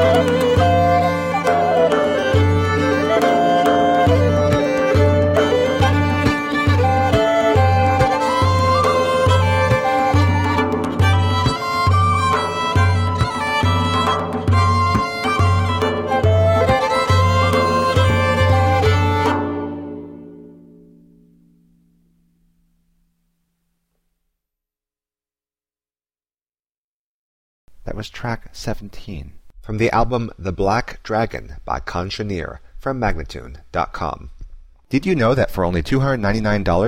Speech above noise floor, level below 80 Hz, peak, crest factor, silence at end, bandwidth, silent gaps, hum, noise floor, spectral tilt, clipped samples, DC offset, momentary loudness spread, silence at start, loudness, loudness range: over 70 dB; -36 dBFS; -4 dBFS; 14 dB; 0 s; 14 kHz; 26.77-27.68 s; 60 Hz at -50 dBFS; under -90 dBFS; -6.5 dB/octave; under 0.1%; under 0.1%; 12 LU; 0 s; -17 LUFS; 10 LU